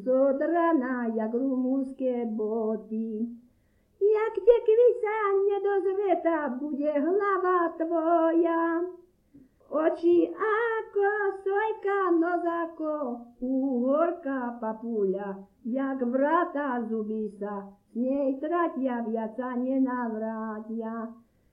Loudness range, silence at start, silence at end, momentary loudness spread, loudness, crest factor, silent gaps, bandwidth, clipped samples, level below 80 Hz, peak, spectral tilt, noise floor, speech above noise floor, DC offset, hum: 5 LU; 0 s; 0.4 s; 10 LU; -27 LUFS; 20 dB; none; 5 kHz; under 0.1%; -66 dBFS; -8 dBFS; -8.5 dB/octave; -66 dBFS; 39 dB; under 0.1%; none